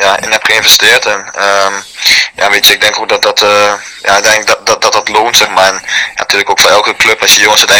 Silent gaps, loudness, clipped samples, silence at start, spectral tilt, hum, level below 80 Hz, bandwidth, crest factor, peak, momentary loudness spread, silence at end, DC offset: none; -6 LUFS; 6%; 0 s; 0.5 dB/octave; none; -44 dBFS; over 20 kHz; 8 dB; 0 dBFS; 8 LU; 0 s; under 0.1%